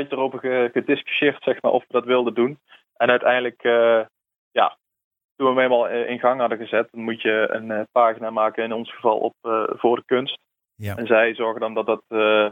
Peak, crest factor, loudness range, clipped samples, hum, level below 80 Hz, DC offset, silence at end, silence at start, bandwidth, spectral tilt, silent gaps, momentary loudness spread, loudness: -4 dBFS; 18 dB; 2 LU; under 0.1%; none; -72 dBFS; under 0.1%; 0 s; 0 s; 16 kHz; -6.5 dB/octave; 4.38-4.51 s, 5.04-5.11 s, 5.24-5.35 s; 7 LU; -21 LUFS